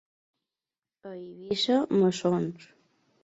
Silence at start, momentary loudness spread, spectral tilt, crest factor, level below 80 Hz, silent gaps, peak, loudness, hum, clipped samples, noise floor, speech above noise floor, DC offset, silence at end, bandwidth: 1.05 s; 19 LU; -6 dB/octave; 16 dB; -70 dBFS; none; -14 dBFS; -26 LUFS; none; under 0.1%; under -90 dBFS; over 63 dB; under 0.1%; 0.6 s; 8 kHz